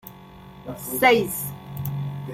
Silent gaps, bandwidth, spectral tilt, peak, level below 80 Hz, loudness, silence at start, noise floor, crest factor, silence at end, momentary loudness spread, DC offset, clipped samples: none; 16.5 kHz; -4.5 dB/octave; -4 dBFS; -54 dBFS; -23 LUFS; 0.05 s; -44 dBFS; 22 dB; 0 s; 21 LU; under 0.1%; under 0.1%